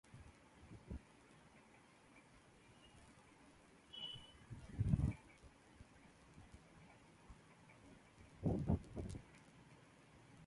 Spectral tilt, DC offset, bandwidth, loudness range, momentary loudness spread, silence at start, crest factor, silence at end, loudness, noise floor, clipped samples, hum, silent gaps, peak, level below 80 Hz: -7 dB/octave; under 0.1%; 11.5 kHz; 14 LU; 24 LU; 0.1 s; 26 dB; 0 s; -45 LUFS; -67 dBFS; under 0.1%; none; none; -22 dBFS; -58 dBFS